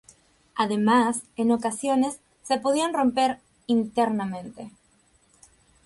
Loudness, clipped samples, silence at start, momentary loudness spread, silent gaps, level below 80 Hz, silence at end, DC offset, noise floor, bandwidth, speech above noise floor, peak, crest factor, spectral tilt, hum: -24 LUFS; under 0.1%; 0.55 s; 16 LU; none; -64 dBFS; 1.15 s; under 0.1%; -63 dBFS; 11.5 kHz; 39 dB; -8 dBFS; 18 dB; -4.5 dB/octave; none